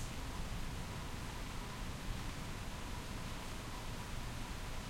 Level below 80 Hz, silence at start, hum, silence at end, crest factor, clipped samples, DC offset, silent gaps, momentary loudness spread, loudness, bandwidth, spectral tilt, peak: -46 dBFS; 0 s; none; 0 s; 14 dB; under 0.1%; under 0.1%; none; 1 LU; -46 LUFS; 16.5 kHz; -4 dB/octave; -28 dBFS